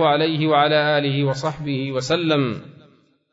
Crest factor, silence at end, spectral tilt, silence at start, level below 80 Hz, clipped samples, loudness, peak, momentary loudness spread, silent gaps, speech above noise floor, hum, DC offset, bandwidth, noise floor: 16 dB; 0.6 s; -6 dB/octave; 0 s; -58 dBFS; under 0.1%; -20 LUFS; -4 dBFS; 9 LU; none; 35 dB; none; under 0.1%; 7.8 kHz; -55 dBFS